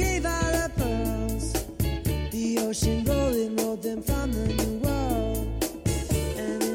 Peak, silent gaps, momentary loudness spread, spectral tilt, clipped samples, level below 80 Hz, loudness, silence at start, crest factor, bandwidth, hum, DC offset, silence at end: -14 dBFS; none; 5 LU; -5.5 dB/octave; under 0.1%; -32 dBFS; -27 LUFS; 0 s; 12 dB; 17 kHz; none; under 0.1%; 0 s